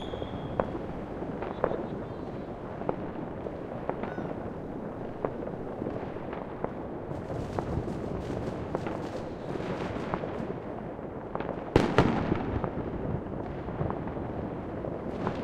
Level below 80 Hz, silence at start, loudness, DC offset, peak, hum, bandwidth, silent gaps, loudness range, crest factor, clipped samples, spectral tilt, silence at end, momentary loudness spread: -46 dBFS; 0 s; -34 LUFS; under 0.1%; -6 dBFS; none; 12.5 kHz; none; 6 LU; 28 dB; under 0.1%; -8 dB/octave; 0 s; 8 LU